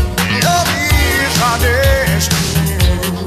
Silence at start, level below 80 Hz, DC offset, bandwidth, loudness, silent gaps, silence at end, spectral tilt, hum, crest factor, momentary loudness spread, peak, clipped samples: 0 s; -20 dBFS; under 0.1%; 14.5 kHz; -13 LUFS; none; 0 s; -4 dB/octave; none; 14 dB; 2 LU; 0 dBFS; under 0.1%